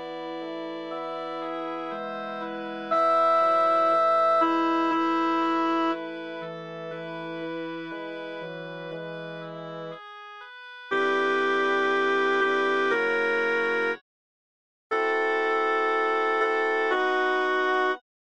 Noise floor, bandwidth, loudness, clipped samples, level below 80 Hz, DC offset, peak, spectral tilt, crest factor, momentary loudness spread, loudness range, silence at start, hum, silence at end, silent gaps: under -90 dBFS; 8.8 kHz; -25 LUFS; under 0.1%; -80 dBFS; 0.2%; -12 dBFS; -5 dB/octave; 14 dB; 15 LU; 13 LU; 0 s; none; 0.4 s; 14.01-14.90 s